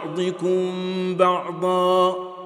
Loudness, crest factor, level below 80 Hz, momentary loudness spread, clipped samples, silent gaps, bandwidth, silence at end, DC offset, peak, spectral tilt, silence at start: -21 LUFS; 18 dB; -78 dBFS; 7 LU; under 0.1%; none; 12.5 kHz; 0 s; under 0.1%; -4 dBFS; -6 dB/octave; 0 s